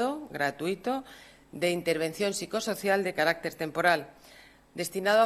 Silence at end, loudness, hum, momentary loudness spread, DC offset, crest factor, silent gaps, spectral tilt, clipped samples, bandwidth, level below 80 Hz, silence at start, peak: 0 s; -29 LUFS; none; 10 LU; under 0.1%; 20 dB; none; -4 dB/octave; under 0.1%; 14.5 kHz; -66 dBFS; 0 s; -8 dBFS